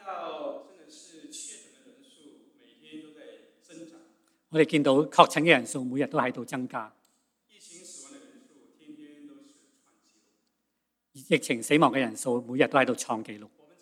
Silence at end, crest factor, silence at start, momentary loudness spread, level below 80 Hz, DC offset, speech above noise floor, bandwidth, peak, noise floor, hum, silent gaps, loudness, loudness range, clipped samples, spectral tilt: 0.35 s; 30 dB; 0.05 s; 26 LU; -86 dBFS; under 0.1%; 55 dB; 15 kHz; 0 dBFS; -80 dBFS; none; none; -26 LUFS; 22 LU; under 0.1%; -4.5 dB/octave